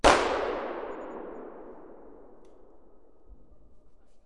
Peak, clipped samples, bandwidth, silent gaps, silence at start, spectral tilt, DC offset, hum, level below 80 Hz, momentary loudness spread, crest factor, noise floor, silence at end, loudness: -4 dBFS; under 0.1%; 11.5 kHz; none; 0 s; -3 dB/octave; 0.3%; none; -48 dBFS; 26 LU; 28 dB; -58 dBFS; 0.9 s; -30 LUFS